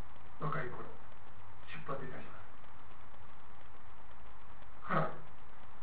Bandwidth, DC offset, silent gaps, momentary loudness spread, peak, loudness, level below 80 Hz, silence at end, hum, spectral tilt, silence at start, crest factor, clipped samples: 4 kHz; 3%; none; 21 LU; -18 dBFS; -42 LUFS; -64 dBFS; 0 s; none; -5.5 dB/octave; 0 s; 26 dB; under 0.1%